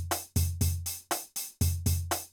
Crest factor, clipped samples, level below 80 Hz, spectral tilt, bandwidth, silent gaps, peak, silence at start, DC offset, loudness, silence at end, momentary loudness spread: 16 dB; under 0.1%; -44 dBFS; -4 dB/octave; over 20 kHz; none; -14 dBFS; 0 s; under 0.1%; -31 LUFS; 0.05 s; 5 LU